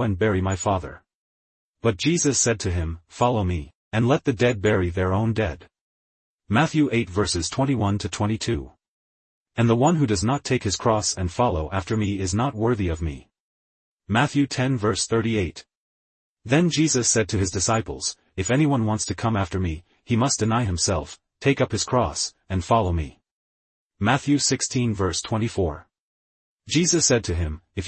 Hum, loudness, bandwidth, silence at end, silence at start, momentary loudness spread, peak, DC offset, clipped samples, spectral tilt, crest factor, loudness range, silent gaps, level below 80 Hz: none; -23 LUFS; 8.8 kHz; 0 s; 0 s; 9 LU; -6 dBFS; under 0.1%; under 0.1%; -4.5 dB/octave; 18 dB; 2 LU; 1.14-1.74 s, 3.75-3.91 s, 5.81-6.39 s, 8.88-9.46 s, 13.40-13.99 s, 15.75-16.37 s, 23.31-23.90 s, 25.99-26.58 s; -46 dBFS